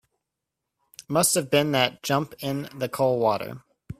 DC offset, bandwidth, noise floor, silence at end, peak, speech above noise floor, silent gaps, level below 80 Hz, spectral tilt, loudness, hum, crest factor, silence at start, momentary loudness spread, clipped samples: under 0.1%; 16 kHz; -84 dBFS; 0.05 s; -4 dBFS; 60 dB; none; -62 dBFS; -3.5 dB/octave; -24 LUFS; none; 22 dB; 1.1 s; 10 LU; under 0.1%